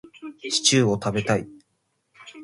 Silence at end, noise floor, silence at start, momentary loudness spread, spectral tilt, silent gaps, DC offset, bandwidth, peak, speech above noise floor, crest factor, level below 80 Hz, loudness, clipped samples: 0 s; -73 dBFS; 0.2 s; 21 LU; -3.5 dB/octave; none; under 0.1%; 11.5 kHz; -4 dBFS; 50 dB; 20 dB; -58 dBFS; -21 LUFS; under 0.1%